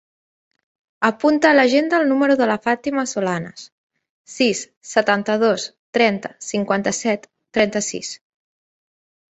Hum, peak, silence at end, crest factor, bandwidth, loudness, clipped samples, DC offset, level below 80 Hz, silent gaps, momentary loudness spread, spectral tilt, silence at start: none; -2 dBFS; 1.2 s; 20 dB; 8.2 kHz; -19 LUFS; under 0.1%; under 0.1%; -62 dBFS; 3.72-3.90 s, 4.10-4.25 s, 4.77-4.81 s, 5.79-5.93 s; 12 LU; -4 dB/octave; 1 s